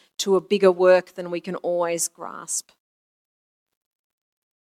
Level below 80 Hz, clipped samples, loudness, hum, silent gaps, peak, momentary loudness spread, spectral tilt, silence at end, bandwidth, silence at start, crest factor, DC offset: -78 dBFS; under 0.1%; -22 LUFS; none; none; -4 dBFS; 13 LU; -3.5 dB/octave; 2.1 s; 15.5 kHz; 0.2 s; 20 dB; under 0.1%